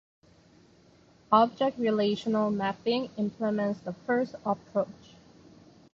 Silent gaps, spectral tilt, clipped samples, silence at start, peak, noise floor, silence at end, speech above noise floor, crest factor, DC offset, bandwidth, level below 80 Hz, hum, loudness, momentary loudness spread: none; -7 dB/octave; under 0.1%; 1.3 s; -10 dBFS; -59 dBFS; 1 s; 31 dB; 20 dB; under 0.1%; 7.4 kHz; -68 dBFS; none; -29 LUFS; 9 LU